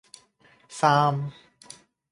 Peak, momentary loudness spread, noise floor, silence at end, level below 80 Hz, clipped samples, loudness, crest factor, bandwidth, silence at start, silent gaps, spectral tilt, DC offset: -6 dBFS; 26 LU; -60 dBFS; 0.8 s; -68 dBFS; under 0.1%; -23 LUFS; 22 dB; 11.5 kHz; 0.7 s; none; -5.5 dB/octave; under 0.1%